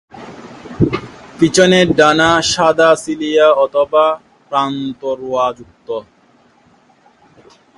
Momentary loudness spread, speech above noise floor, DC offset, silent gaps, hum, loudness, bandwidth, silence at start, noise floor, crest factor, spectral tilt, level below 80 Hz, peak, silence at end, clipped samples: 24 LU; 38 dB; under 0.1%; none; none; -13 LUFS; 11.5 kHz; 0.15 s; -51 dBFS; 16 dB; -4.5 dB/octave; -46 dBFS; 0 dBFS; 1.75 s; under 0.1%